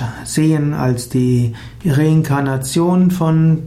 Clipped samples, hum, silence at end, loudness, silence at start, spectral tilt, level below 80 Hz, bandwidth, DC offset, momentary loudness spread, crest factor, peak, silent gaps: under 0.1%; none; 0 s; -16 LUFS; 0 s; -7 dB/octave; -42 dBFS; 15 kHz; under 0.1%; 5 LU; 10 dB; -4 dBFS; none